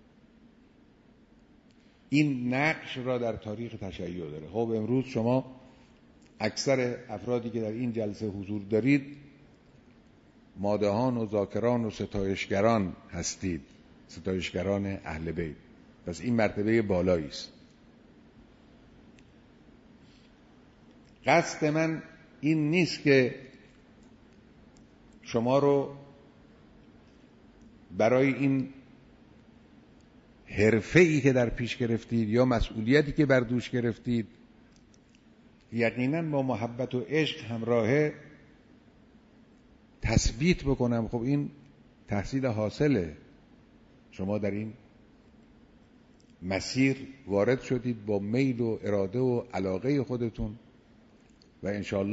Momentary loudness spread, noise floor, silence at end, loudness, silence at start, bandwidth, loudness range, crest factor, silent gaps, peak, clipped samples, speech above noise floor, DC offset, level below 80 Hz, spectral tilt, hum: 14 LU; -59 dBFS; 0 s; -29 LUFS; 2.1 s; 8 kHz; 5 LU; 24 dB; none; -8 dBFS; under 0.1%; 31 dB; under 0.1%; -50 dBFS; -6 dB/octave; none